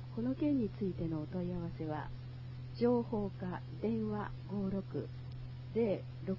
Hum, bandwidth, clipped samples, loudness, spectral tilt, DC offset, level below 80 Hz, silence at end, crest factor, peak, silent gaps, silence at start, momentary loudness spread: none; 5.8 kHz; under 0.1%; -38 LUFS; -8.5 dB/octave; under 0.1%; -56 dBFS; 0 s; 18 dB; -20 dBFS; none; 0 s; 13 LU